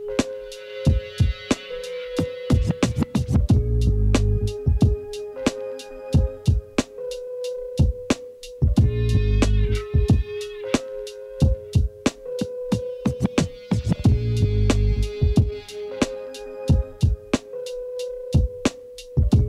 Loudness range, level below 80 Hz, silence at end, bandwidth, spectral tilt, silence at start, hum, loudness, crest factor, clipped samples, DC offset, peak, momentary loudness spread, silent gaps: 3 LU; -26 dBFS; 0 s; 12.5 kHz; -6.5 dB/octave; 0 s; none; -23 LUFS; 16 dB; under 0.1%; under 0.1%; -6 dBFS; 11 LU; none